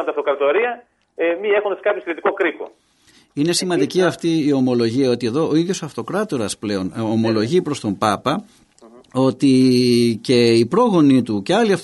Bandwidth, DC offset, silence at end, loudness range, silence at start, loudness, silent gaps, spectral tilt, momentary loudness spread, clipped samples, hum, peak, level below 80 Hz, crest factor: 11.5 kHz; under 0.1%; 0 s; 5 LU; 0 s; -18 LUFS; none; -5.5 dB/octave; 9 LU; under 0.1%; none; -2 dBFS; -60 dBFS; 16 dB